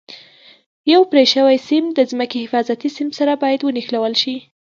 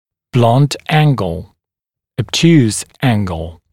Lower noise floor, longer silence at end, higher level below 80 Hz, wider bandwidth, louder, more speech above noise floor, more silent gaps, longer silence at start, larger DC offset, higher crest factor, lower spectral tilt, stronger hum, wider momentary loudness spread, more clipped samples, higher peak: second, -46 dBFS vs -86 dBFS; about the same, 0.3 s vs 0.2 s; second, -72 dBFS vs -40 dBFS; second, 7.4 kHz vs 14 kHz; about the same, -16 LUFS vs -14 LUFS; second, 30 dB vs 72 dB; first, 0.66-0.84 s vs none; second, 0.1 s vs 0.35 s; second, under 0.1% vs 0.5%; about the same, 16 dB vs 14 dB; second, -3.5 dB/octave vs -6 dB/octave; neither; second, 10 LU vs 14 LU; neither; about the same, 0 dBFS vs 0 dBFS